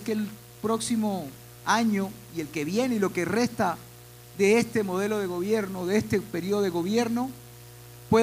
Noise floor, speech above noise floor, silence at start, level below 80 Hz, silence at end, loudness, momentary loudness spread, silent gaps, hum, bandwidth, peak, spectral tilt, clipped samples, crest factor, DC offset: -47 dBFS; 21 dB; 0 s; -60 dBFS; 0 s; -27 LUFS; 18 LU; none; none; 16 kHz; -10 dBFS; -5 dB/octave; under 0.1%; 18 dB; under 0.1%